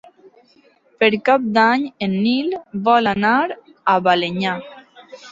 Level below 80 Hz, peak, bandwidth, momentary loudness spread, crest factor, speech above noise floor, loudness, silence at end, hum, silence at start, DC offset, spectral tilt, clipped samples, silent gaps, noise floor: -60 dBFS; -2 dBFS; 7.8 kHz; 8 LU; 18 dB; 38 dB; -18 LUFS; 0 s; none; 1 s; under 0.1%; -6.5 dB/octave; under 0.1%; none; -55 dBFS